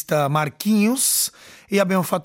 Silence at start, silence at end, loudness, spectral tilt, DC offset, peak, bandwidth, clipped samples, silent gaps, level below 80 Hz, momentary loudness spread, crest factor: 0 s; 0.05 s; -19 LUFS; -4 dB/octave; under 0.1%; -6 dBFS; 17 kHz; under 0.1%; none; -64 dBFS; 6 LU; 16 dB